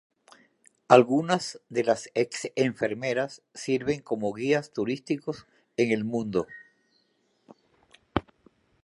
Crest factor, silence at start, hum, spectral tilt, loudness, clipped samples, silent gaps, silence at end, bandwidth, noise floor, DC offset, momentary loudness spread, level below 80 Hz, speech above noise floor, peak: 26 dB; 0.9 s; none; -5.5 dB/octave; -27 LUFS; under 0.1%; none; 0.65 s; 11.5 kHz; -70 dBFS; under 0.1%; 14 LU; -60 dBFS; 44 dB; -2 dBFS